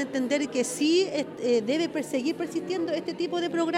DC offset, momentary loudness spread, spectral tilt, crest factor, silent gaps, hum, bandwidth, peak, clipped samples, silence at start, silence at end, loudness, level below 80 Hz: under 0.1%; 6 LU; -3.5 dB/octave; 14 dB; none; none; 15 kHz; -12 dBFS; under 0.1%; 0 s; 0 s; -27 LUFS; -72 dBFS